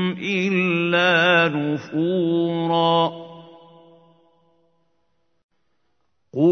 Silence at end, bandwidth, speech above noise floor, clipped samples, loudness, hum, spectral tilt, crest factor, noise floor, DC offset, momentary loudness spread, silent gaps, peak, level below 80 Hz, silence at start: 0 s; 6.6 kHz; 54 dB; under 0.1%; -19 LUFS; none; -6.5 dB/octave; 20 dB; -73 dBFS; under 0.1%; 9 LU; 5.43-5.49 s; -2 dBFS; -74 dBFS; 0 s